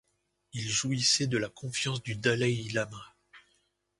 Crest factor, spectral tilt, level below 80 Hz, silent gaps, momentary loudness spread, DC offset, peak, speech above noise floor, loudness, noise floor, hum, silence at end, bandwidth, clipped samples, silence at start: 22 dB; -3.5 dB/octave; -64 dBFS; none; 13 LU; under 0.1%; -12 dBFS; 44 dB; -29 LUFS; -75 dBFS; none; 0.6 s; 11.5 kHz; under 0.1%; 0.55 s